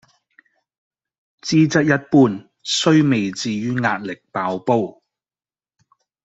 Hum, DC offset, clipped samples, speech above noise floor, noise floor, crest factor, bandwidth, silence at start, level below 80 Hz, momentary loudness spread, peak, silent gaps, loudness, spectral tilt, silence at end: none; under 0.1%; under 0.1%; over 72 dB; under -90 dBFS; 18 dB; 8 kHz; 1.45 s; -60 dBFS; 12 LU; -2 dBFS; none; -18 LUFS; -5.5 dB/octave; 1.35 s